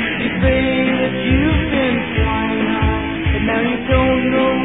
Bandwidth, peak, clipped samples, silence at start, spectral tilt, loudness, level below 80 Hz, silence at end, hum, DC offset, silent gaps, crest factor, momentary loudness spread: 4 kHz; -2 dBFS; under 0.1%; 0 s; -10.5 dB/octave; -16 LUFS; -26 dBFS; 0 s; none; 0.6%; none; 14 dB; 3 LU